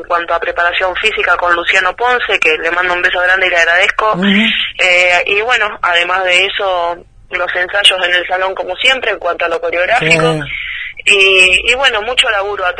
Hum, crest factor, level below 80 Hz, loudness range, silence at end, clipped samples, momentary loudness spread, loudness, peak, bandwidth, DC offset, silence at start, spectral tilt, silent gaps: none; 12 dB; -42 dBFS; 3 LU; 0 s; 0.2%; 8 LU; -11 LUFS; 0 dBFS; 11 kHz; under 0.1%; 0 s; -2.5 dB/octave; none